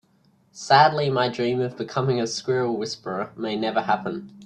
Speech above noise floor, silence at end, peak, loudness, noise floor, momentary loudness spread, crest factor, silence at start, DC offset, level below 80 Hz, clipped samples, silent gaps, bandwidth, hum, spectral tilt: 38 dB; 0 s; -2 dBFS; -23 LUFS; -61 dBFS; 12 LU; 20 dB; 0.55 s; under 0.1%; -66 dBFS; under 0.1%; none; 10.5 kHz; none; -5 dB/octave